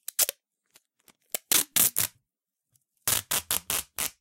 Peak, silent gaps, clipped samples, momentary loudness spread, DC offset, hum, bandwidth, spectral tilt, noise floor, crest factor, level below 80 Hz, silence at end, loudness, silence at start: -2 dBFS; none; under 0.1%; 10 LU; under 0.1%; none; 17 kHz; 0.5 dB/octave; -86 dBFS; 28 dB; -60 dBFS; 0.1 s; -26 LUFS; 0.2 s